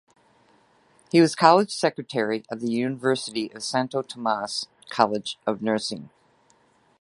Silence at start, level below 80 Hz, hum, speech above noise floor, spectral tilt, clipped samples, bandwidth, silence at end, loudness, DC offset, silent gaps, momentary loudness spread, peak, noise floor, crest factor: 1.15 s; -70 dBFS; none; 38 dB; -4.5 dB/octave; under 0.1%; 11.5 kHz; 0.95 s; -24 LUFS; under 0.1%; none; 12 LU; 0 dBFS; -62 dBFS; 24 dB